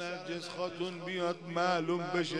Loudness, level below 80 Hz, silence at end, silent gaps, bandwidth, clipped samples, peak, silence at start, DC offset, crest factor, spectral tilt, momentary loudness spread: -35 LUFS; -78 dBFS; 0 s; none; 10.5 kHz; under 0.1%; -16 dBFS; 0 s; under 0.1%; 18 dB; -5 dB/octave; 8 LU